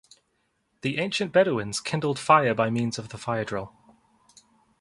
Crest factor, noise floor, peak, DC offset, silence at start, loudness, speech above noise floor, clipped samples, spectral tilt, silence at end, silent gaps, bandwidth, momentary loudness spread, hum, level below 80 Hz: 22 dB; -73 dBFS; -4 dBFS; under 0.1%; 0.85 s; -25 LUFS; 48 dB; under 0.1%; -5 dB/octave; 1.1 s; none; 11.5 kHz; 13 LU; none; -62 dBFS